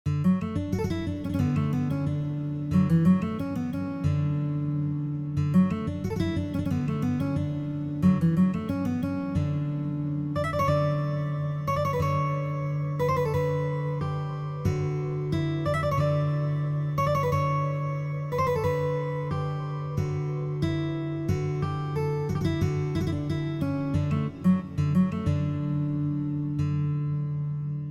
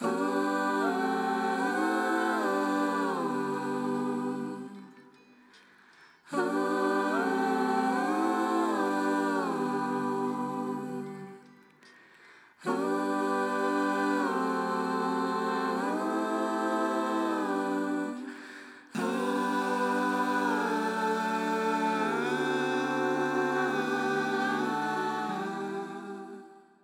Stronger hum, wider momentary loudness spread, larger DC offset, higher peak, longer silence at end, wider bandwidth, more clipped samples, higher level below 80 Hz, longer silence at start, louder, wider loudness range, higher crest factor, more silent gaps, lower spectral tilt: neither; about the same, 6 LU vs 8 LU; neither; first, -12 dBFS vs -16 dBFS; second, 0 s vs 0.25 s; second, 13.5 kHz vs 17 kHz; neither; first, -48 dBFS vs under -90 dBFS; about the same, 0.05 s vs 0 s; first, -27 LUFS vs -30 LUFS; second, 2 LU vs 5 LU; about the same, 16 dB vs 14 dB; neither; first, -8.5 dB/octave vs -5 dB/octave